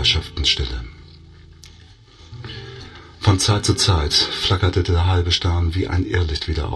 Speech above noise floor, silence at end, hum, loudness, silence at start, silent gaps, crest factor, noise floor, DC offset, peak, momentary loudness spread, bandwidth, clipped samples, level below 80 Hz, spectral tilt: 27 dB; 0 s; none; -18 LUFS; 0 s; none; 16 dB; -46 dBFS; under 0.1%; -4 dBFS; 18 LU; 12.5 kHz; under 0.1%; -30 dBFS; -4 dB/octave